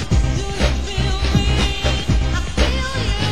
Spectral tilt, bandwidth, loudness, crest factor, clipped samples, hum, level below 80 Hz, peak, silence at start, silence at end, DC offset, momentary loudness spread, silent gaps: -5 dB/octave; 11.5 kHz; -19 LUFS; 14 dB; under 0.1%; none; -20 dBFS; -4 dBFS; 0 s; 0 s; 3%; 3 LU; none